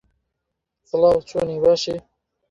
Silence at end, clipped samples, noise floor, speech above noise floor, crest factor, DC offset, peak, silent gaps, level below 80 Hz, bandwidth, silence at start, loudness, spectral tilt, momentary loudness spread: 0.5 s; under 0.1%; -80 dBFS; 61 dB; 18 dB; under 0.1%; -4 dBFS; none; -52 dBFS; 7.8 kHz; 0.95 s; -20 LUFS; -5.5 dB/octave; 10 LU